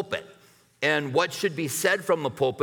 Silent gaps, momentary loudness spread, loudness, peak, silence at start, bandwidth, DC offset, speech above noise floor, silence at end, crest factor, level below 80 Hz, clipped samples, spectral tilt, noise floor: none; 5 LU; -26 LUFS; -8 dBFS; 0 s; over 20 kHz; under 0.1%; 32 dB; 0 s; 18 dB; -70 dBFS; under 0.1%; -3.5 dB/octave; -57 dBFS